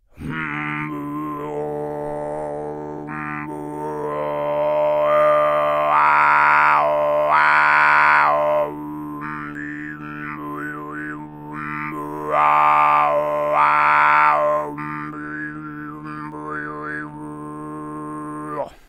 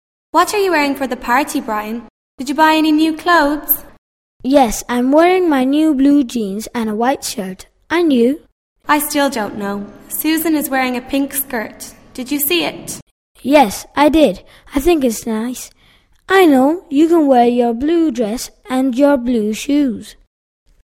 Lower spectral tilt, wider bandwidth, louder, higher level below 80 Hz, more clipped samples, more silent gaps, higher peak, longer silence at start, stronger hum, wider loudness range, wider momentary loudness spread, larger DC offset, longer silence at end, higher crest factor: first, -6 dB/octave vs -3.5 dB/octave; second, 14 kHz vs 16.5 kHz; second, -19 LUFS vs -15 LUFS; second, -54 dBFS vs -42 dBFS; neither; second, none vs 2.10-2.38 s, 3.98-4.40 s, 8.52-8.76 s, 13.02-13.35 s; about the same, 0 dBFS vs 0 dBFS; second, 0.2 s vs 0.35 s; neither; first, 14 LU vs 4 LU; about the same, 17 LU vs 15 LU; neither; second, 0.2 s vs 0.85 s; about the same, 20 dB vs 16 dB